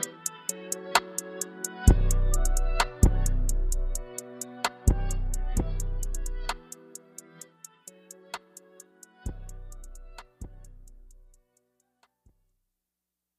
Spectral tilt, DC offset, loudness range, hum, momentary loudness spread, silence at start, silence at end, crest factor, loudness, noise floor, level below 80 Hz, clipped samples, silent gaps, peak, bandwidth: -4 dB/octave; under 0.1%; 20 LU; none; 23 LU; 0 s; 2.55 s; 24 dB; -30 LUFS; -87 dBFS; -30 dBFS; under 0.1%; none; -4 dBFS; 15 kHz